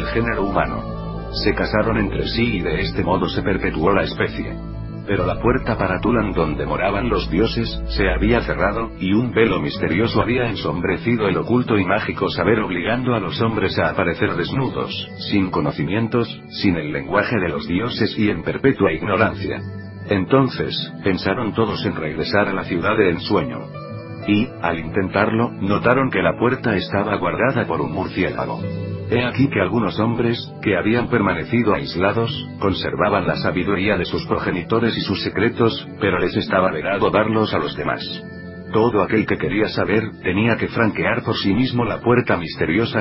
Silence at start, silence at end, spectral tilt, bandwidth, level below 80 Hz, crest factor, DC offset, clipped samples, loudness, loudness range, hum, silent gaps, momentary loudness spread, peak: 0 s; 0 s; -10.5 dB/octave; 5.8 kHz; -36 dBFS; 20 dB; under 0.1%; under 0.1%; -20 LUFS; 2 LU; none; none; 6 LU; 0 dBFS